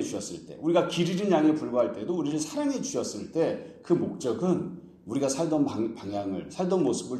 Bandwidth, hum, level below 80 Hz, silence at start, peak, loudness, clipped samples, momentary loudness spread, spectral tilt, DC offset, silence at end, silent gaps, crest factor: 12.5 kHz; none; -66 dBFS; 0 s; -10 dBFS; -28 LUFS; under 0.1%; 9 LU; -5.5 dB/octave; under 0.1%; 0 s; none; 18 dB